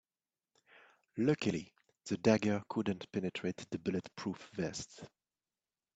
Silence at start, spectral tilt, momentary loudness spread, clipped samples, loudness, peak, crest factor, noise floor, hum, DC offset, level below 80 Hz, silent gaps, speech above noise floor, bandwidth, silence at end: 1.15 s; -6 dB/octave; 18 LU; under 0.1%; -37 LUFS; -14 dBFS; 24 dB; under -90 dBFS; none; under 0.1%; -72 dBFS; none; over 54 dB; 8.4 kHz; 0.9 s